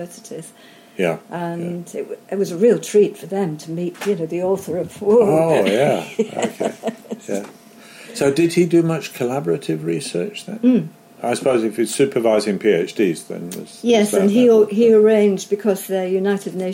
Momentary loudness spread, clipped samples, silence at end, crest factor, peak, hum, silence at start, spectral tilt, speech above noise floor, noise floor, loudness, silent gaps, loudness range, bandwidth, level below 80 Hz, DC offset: 14 LU; under 0.1%; 0 s; 14 dB; -4 dBFS; none; 0 s; -5.5 dB/octave; 23 dB; -41 dBFS; -18 LUFS; none; 5 LU; 16.5 kHz; -64 dBFS; under 0.1%